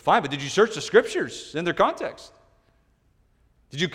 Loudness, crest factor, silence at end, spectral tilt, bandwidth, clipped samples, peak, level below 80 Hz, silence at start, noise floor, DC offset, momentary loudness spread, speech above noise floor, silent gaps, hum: -23 LUFS; 22 dB; 0 s; -4 dB/octave; 12.5 kHz; under 0.1%; -2 dBFS; -58 dBFS; 0.05 s; -64 dBFS; under 0.1%; 13 LU; 41 dB; none; none